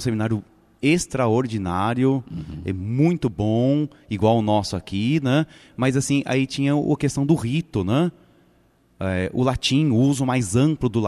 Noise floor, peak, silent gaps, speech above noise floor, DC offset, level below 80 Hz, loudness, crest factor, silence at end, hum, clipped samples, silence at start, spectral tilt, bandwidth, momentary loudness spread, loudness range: -59 dBFS; -6 dBFS; none; 38 dB; under 0.1%; -48 dBFS; -22 LUFS; 16 dB; 0 s; none; under 0.1%; 0 s; -6 dB/octave; 13.5 kHz; 7 LU; 2 LU